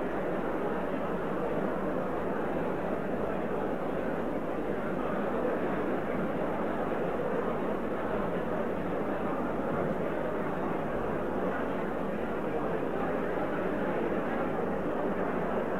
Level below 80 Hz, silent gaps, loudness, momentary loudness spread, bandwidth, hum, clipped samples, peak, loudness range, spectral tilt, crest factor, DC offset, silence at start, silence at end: -52 dBFS; none; -32 LUFS; 2 LU; 16 kHz; 50 Hz at -50 dBFS; under 0.1%; -18 dBFS; 1 LU; -8 dB/octave; 12 dB; 1%; 0 s; 0 s